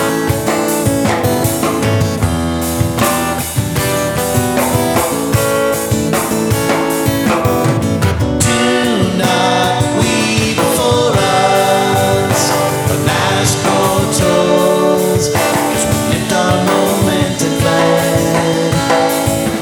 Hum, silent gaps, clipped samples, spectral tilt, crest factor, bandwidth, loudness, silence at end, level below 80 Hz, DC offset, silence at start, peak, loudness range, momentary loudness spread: none; none; under 0.1%; -4.5 dB/octave; 12 dB; 20 kHz; -13 LUFS; 0 s; -34 dBFS; under 0.1%; 0 s; 0 dBFS; 2 LU; 3 LU